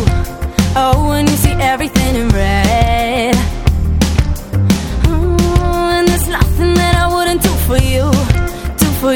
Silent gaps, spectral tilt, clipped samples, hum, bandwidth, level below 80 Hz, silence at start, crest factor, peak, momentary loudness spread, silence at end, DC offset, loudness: none; -5.5 dB/octave; 0.1%; none; 18.5 kHz; -18 dBFS; 0 s; 12 dB; 0 dBFS; 4 LU; 0 s; under 0.1%; -13 LUFS